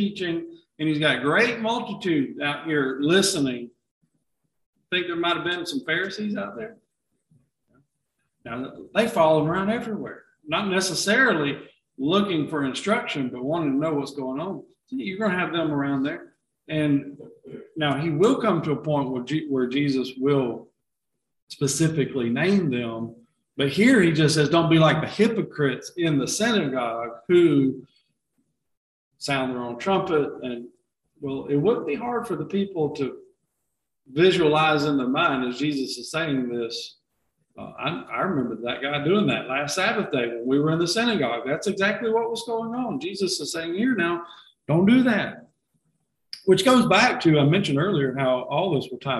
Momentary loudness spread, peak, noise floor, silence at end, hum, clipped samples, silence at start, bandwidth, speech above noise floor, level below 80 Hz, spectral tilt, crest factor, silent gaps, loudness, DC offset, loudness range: 14 LU; -4 dBFS; -82 dBFS; 0 s; none; under 0.1%; 0 s; 12.5 kHz; 59 dB; -62 dBFS; -5 dB/octave; 20 dB; 3.91-4.01 s, 4.66-4.73 s, 21.42-21.47 s, 28.77-29.11 s; -23 LUFS; under 0.1%; 7 LU